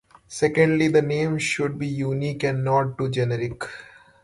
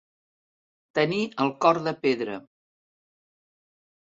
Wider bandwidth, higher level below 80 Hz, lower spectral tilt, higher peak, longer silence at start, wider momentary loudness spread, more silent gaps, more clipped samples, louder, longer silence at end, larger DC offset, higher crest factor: first, 11.5 kHz vs 7.8 kHz; first, -56 dBFS vs -72 dBFS; about the same, -6 dB/octave vs -6 dB/octave; about the same, -6 dBFS vs -6 dBFS; second, 0.3 s vs 0.95 s; first, 13 LU vs 10 LU; neither; neither; about the same, -23 LUFS vs -25 LUFS; second, 0.4 s vs 1.75 s; neither; second, 18 dB vs 24 dB